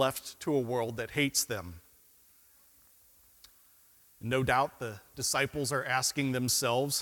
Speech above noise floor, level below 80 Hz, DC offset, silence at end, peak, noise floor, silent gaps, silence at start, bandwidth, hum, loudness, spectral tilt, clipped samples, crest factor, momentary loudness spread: 31 dB; -62 dBFS; under 0.1%; 0 s; -12 dBFS; -62 dBFS; none; 0 s; 18 kHz; none; -31 LUFS; -3 dB/octave; under 0.1%; 22 dB; 11 LU